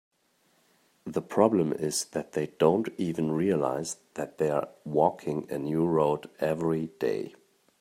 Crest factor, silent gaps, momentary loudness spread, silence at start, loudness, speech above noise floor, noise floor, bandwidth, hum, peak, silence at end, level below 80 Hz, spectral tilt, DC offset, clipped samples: 22 dB; none; 10 LU; 1.05 s; -28 LUFS; 41 dB; -69 dBFS; 16 kHz; none; -6 dBFS; 0.5 s; -68 dBFS; -6 dB/octave; under 0.1%; under 0.1%